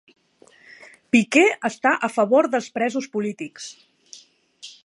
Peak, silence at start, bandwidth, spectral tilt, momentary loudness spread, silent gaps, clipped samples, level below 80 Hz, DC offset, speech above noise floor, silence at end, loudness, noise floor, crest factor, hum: -2 dBFS; 1.15 s; 11.5 kHz; -4 dB/octave; 20 LU; none; under 0.1%; -72 dBFS; under 0.1%; 34 dB; 0.15 s; -20 LUFS; -55 dBFS; 20 dB; none